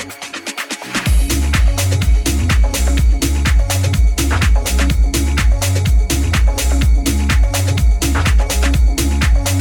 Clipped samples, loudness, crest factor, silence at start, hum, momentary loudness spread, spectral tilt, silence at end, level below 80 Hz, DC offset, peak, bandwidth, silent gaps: under 0.1%; -15 LUFS; 12 dB; 0 s; none; 1 LU; -4.5 dB/octave; 0 s; -14 dBFS; under 0.1%; -2 dBFS; 18.5 kHz; none